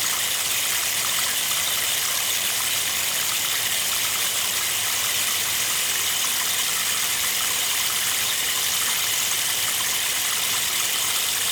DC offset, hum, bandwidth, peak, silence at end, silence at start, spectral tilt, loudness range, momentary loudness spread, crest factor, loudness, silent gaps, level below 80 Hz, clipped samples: under 0.1%; none; over 20 kHz; -8 dBFS; 0 s; 0 s; 1.5 dB/octave; 0 LU; 1 LU; 14 dB; -20 LUFS; none; -60 dBFS; under 0.1%